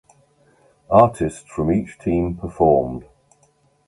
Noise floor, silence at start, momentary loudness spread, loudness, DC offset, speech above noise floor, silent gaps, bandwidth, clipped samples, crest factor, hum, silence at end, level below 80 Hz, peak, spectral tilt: -60 dBFS; 0.9 s; 11 LU; -19 LUFS; under 0.1%; 42 dB; none; 11.5 kHz; under 0.1%; 20 dB; none; 0.85 s; -40 dBFS; 0 dBFS; -8.5 dB/octave